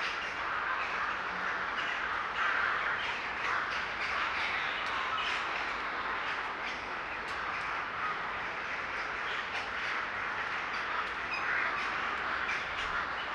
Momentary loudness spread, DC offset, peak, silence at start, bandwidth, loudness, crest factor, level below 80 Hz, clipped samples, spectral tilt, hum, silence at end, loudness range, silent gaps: 4 LU; under 0.1%; -18 dBFS; 0 s; 12 kHz; -33 LUFS; 16 dB; -60 dBFS; under 0.1%; -2.5 dB/octave; none; 0 s; 3 LU; none